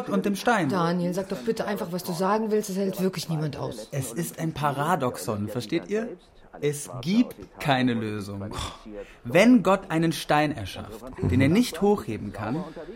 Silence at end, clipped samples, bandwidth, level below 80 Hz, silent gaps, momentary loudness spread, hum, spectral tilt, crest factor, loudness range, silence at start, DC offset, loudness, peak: 0 s; under 0.1%; 16.5 kHz; -52 dBFS; none; 13 LU; none; -6 dB/octave; 20 dB; 5 LU; 0 s; under 0.1%; -26 LUFS; -6 dBFS